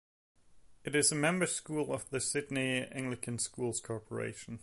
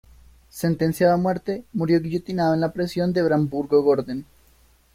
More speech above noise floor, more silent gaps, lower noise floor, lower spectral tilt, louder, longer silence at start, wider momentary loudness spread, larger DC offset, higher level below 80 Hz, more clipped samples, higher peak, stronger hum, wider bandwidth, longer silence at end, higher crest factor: second, 25 dB vs 35 dB; neither; about the same, -60 dBFS vs -57 dBFS; second, -3.5 dB/octave vs -7.5 dB/octave; second, -34 LUFS vs -22 LUFS; about the same, 0.5 s vs 0.55 s; about the same, 11 LU vs 9 LU; neither; second, -68 dBFS vs -52 dBFS; neither; second, -16 dBFS vs -6 dBFS; neither; second, 12 kHz vs 16 kHz; second, 0 s vs 0.7 s; about the same, 18 dB vs 16 dB